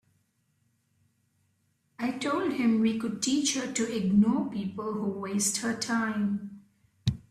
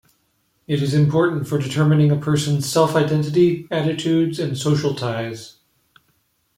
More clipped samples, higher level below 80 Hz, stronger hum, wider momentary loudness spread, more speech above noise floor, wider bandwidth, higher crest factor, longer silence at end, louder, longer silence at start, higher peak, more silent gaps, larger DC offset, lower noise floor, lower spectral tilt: neither; about the same, -60 dBFS vs -56 dBFS; neither; about the same, 9 LU vs 8 LU; about the same, 45 dB vs 47 dB; second, 13.5 kHz vs 15 kHz; about the same, 16 dB vs 16 dB; second, 0.1 s vs 1.05 s; second, -29 LUFS vs -19 LUFS; first, 2 s vs 0.7 s; second, -14 dBFS vs -2 dBFS; neither; neither; first, -72 dBFS vs -66 dBFS; second, -4.5 dB/octave vs -6.5 dB/octave